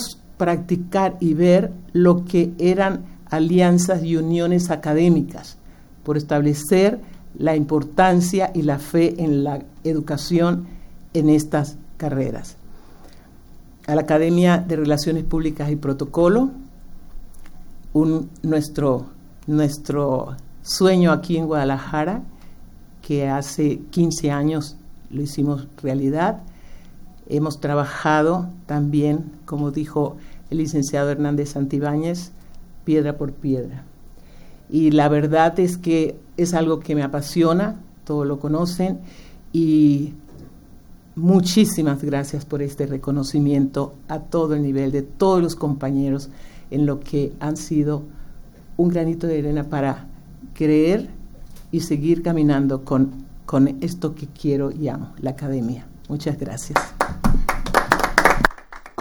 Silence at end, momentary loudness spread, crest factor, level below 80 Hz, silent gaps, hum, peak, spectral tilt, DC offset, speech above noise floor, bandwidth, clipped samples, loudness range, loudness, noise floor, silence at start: 0.1 s; 11 LU; 20 dB; -36 dBFS; none; none; 0 dBFS; -6.5 dB/octave; under 0.1%; 24 dB; over 20 kHz; under 0.1%; 5 LU; -20 LUFS; -43 dBFS; 0 s